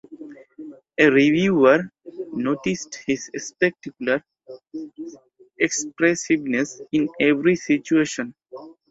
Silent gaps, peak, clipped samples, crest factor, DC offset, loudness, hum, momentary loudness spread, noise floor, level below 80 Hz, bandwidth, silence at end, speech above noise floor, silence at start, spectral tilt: none; -2 dBFS; under 0.1%; 20 dB; under 0.1%; -21 LUFS; none; 24 LU; -42 dBFS; -62 dBFS; 8 kHz; 0.2 s; 21 dB; 0.1 s; -4.5 dB/octave